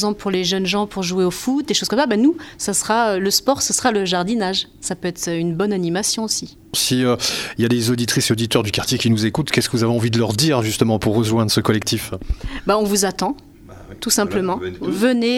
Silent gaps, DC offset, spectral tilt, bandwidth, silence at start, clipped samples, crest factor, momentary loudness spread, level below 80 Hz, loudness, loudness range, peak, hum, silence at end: none; under 0.1%; -4 dB/octave; 17 kHz; 0 s; under 0.1%; 18 dB; 7 LU; -40 dBFS; -19 LUFS; 2 LU; 0 dBFS; none; 0 s